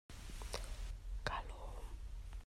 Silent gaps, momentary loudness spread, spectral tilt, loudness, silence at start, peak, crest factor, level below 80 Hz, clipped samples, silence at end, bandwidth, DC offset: none; 9 LU; -3.5 dB/octave; -48 LUFS; 0.1 s; -22 dBFS; 24 dB; -48 dBFS; under 0.1%; 0 s; 15.5 kHz; under 0.1%